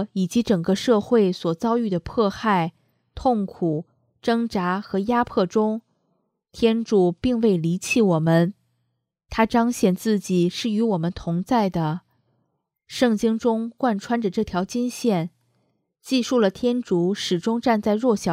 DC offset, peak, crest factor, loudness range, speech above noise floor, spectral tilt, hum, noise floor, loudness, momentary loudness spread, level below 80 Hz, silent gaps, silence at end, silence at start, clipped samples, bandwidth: under 0.1%; -4 dBFS; 18 dB; 3 LU; 54 dB; -6 dB/octave; none; -75 dBFS; -22 LUFS; 6 LU; -52 dBFS; none; 0 s; 0 s; under 0.1%; 15 kHz